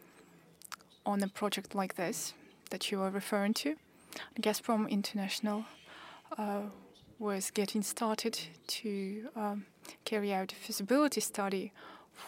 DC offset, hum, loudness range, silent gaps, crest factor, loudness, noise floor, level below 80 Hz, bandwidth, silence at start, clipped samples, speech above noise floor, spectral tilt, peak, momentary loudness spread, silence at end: under 0.1%; none; 2 LU; none; 20 dB; -36 LUFS; -61 dBFS; -80 dBFS; 16 kHz; 0.15 s; under 0.1%; 25 dB; -4 dB/octave; -18 dBFS; 17 LU; 0 s